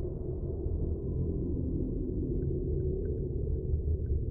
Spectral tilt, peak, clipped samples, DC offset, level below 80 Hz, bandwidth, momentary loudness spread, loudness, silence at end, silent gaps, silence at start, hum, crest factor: -16.5 dB/octave; -20 dBFS; under 0.1%; under 0.1%; -36 dBFS; 1.6 kHz; 3 LU; -34 LUFS; 0 s; none; 0 s; none; 12 dB